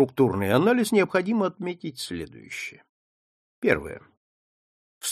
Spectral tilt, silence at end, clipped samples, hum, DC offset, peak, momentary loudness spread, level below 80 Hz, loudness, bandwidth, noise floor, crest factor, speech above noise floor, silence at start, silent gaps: -5 dB/octave; 0 s; under 0.1%; none; under 0.1%; -4 dBFS; 15 LU; -58 dBFS; -25 LUFS; 15 kHz; under -90 dBFS; 22 dB; over 66 dB; 0 s; 2.89-3.62 s, 4.17-5.01 s